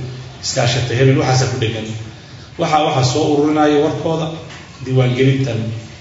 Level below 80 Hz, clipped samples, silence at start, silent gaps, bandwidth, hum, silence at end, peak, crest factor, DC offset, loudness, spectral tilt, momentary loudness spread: -46 dBFS; under 0.1%; 0 s; none; 8 kHz; none; 0 s; 0 dBFS; 16 dB; under 0.1%; -16 LUFS; -5.5 dB/octave; 17 LU